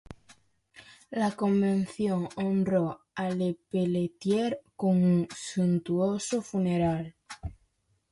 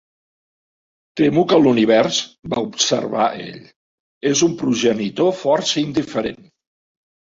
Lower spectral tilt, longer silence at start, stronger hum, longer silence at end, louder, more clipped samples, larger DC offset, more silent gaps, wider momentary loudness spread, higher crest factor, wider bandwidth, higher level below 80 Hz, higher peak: first, -7 dB/octave vs -4 dB/octave; second, 0.1 s vs 1.15 s; neither; second, 0.6 s vs 1 s; second, -29 LUFS vs -18 LUFS; neither; neither; second, none vs 3.76-4.21 s; about the same, 9 LU vs 11 LU; about the same, 14 dB vs 18 dB; first, 11.5 kHz vs 7.8 kHz; about the same, -56 dBFS vs -58 dBFS; second, -14 dBFS vs -2 dBFS